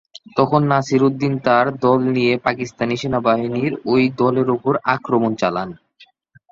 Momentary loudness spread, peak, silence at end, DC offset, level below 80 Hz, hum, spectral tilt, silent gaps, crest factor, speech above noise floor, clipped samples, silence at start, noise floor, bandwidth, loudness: 6 LU; -2 dBFS; 0.75 s; under 0.1%; -56 dBFS; none; -7 dB/octave; none; 16 dB; 35 dB; under 0.1%; 0.35 s; -52 dBFS; 7.6 kHz; -18 LUFS